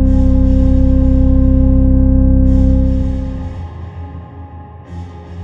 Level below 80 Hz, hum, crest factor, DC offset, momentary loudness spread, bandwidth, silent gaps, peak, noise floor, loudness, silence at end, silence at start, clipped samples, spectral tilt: -14 dBFS; none; 10 dB; under 0.1%; 20 LU; 3.2 kHz; none; -2 dBFS; -32 dBFS; -13 LUFS; 0 s; 0 s; under 0.1%; -11 dB/octave